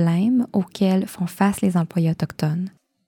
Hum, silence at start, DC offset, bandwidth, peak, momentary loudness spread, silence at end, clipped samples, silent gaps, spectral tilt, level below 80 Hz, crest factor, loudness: none; 0 s; under 0.1%; 18 kHz; -6 dBFS; 7 LU; 0.4 s; under 0.1%; none; -7.5 dB/octave; -56 dBFS; 16 dB; -22 LUFS